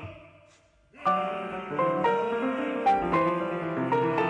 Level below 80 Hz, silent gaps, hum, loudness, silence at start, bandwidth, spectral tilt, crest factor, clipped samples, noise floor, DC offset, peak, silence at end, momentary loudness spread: -60 dBFS; none; none; -27 LUFS; 0 s; 10 kHz; -7.5 dB/octave; 14 dB; under 0.1%; -60 dBFS; under 0.1%; -14 dBFS; 0 s; 7 LU